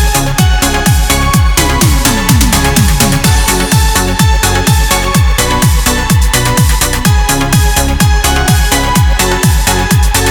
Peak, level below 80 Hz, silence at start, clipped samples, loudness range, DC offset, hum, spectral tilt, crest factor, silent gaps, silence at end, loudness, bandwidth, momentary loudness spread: 0 dBFS; -12 dBFS; 0 s; under 0.1%; 1 LU; under 0.1%; none; -4 dB/octave; 8 dB; none; 0 s; -9 LUFS; over 20 kHz; 2 LU